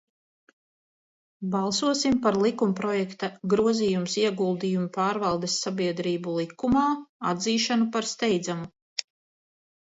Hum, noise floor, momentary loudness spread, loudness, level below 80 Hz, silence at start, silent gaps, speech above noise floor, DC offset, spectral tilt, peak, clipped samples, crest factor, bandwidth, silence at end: none; under -90 dBFS; 9 LU; -26 LUFS; -60 dBFS; 1.4 s; 7.09-7.20 s, 8.82-8.96 s; over 65 dB; under 0.1%; -4.5 dB/octave; -6 dBFS; under 0.1%; 20 dB; 8 kHz; 0.8 s